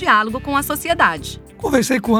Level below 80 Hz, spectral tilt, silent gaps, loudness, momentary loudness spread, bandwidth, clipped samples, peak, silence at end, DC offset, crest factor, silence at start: -40 dBFS; -4 dB/octave; none; -18 LUFS; 11 LU; 19.5 kHz; under 0.1%; -2 dBFS; 0 s; under 0.1%; 16 dB; 0 s